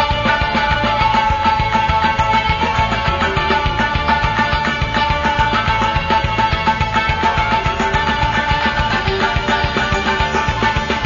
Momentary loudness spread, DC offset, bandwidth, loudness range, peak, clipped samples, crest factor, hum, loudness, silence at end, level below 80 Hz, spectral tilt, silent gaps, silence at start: 2 LU; under 0.1%; 7.4 kHz; 1 LU; -2 dBFS; under 0.1%; 14 dB; none; -16 LUFS; 0 s; -26 dBFS; -5 dB/octave; none; 0 s